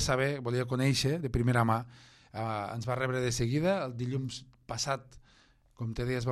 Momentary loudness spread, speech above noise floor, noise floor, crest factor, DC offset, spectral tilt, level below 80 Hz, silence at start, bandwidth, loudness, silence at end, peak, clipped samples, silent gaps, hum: 12 LU; 32 dB; -63 dBFS; 18 dB; under 0.1%; -5 dB/octave; -52 dBFS; 0 s; 13 kHz; -32 LUFS; 0 s; -14 dBFS; under 0.1%; none; none